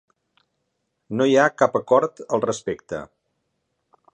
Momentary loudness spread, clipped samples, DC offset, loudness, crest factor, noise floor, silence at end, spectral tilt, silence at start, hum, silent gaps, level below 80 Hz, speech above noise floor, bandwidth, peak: 14 LU; under 0.1%; under 0.1%; -21 LUFS; 20 dB; -75 dBFS; 1.1 s; -5 dB/octave; 1.1 s; none; none; -64 dBFS; 55 dB; 9.4 kHz; -2 dBFS